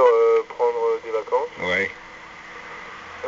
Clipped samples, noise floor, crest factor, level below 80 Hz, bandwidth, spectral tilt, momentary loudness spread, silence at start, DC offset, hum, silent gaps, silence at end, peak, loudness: under 0.1%; -41 dBFS; 18 dB; -60 dBFS; 7.4 kHz; -1.5 dB/octave; 20 LU; 0 s; under 0.1%; none; none; 0 s; -4 dBFS; -22 LUFS